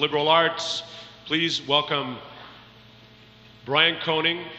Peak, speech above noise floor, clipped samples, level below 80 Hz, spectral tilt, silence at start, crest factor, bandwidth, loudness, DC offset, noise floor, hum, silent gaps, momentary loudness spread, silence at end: -6 dBFS; 27 dB; under 0.1%; -64 dBFS; -3.5 dB/octave; 0 s; 20 dB; 8.8 kHz; -22 LUFS; under 0.1%; -50 dBFS; 60 Hz at -55 dBFS; none; 21 LU; 0 s